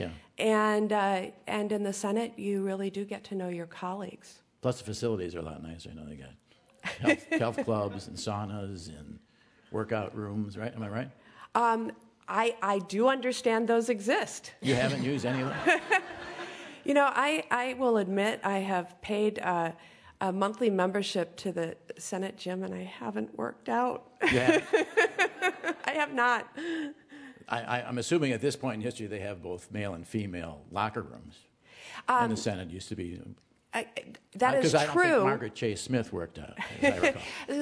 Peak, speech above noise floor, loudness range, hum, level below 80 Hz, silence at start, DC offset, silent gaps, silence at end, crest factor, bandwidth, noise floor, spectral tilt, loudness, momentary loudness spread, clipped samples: -10 dBFS; 20 dB; 7 LU; none; -64 dBFS; 0 s; under 0.1%; none; 0 s; 22 dB; 11 kHz; -51 dBFS; -5 dB/octave; -30 LUFS; 15 LU; under 0.1%